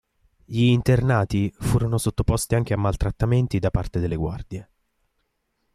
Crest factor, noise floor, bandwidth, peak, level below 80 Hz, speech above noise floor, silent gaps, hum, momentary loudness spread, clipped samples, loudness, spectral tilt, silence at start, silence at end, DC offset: 16 dB; -73 dBFS; 14.5 kHz; -8 dBFS; -36 dBFS; 51 dB; none; none; 10 LU; under 0.1%; -23 LUFS; -6.5 dB/octave; 0.5 s; 1.1 s; under 0.1%